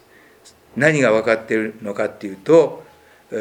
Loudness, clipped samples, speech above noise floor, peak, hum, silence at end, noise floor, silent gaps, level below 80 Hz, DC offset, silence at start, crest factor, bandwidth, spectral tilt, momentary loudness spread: -18 LUFS; under 0.1%; 32 dB; 0 dBFS; none; 0 s; -49 dBFS; none; -62 dBFS; under 0.1%; 0.75 s; 20 dB; 10.5 kHz; -6 dB/octave; 16 LU